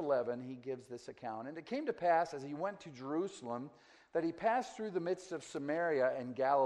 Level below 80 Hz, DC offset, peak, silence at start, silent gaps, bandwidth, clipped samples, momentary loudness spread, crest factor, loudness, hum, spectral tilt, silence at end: -80 dBFS; under 0.1%; -20 dBFS; 0 s; none; 10.5 kHz; under 0.1%; 12 LU; 18 dB; -38 LUFS; none; -5.5 dB/octave; 0 s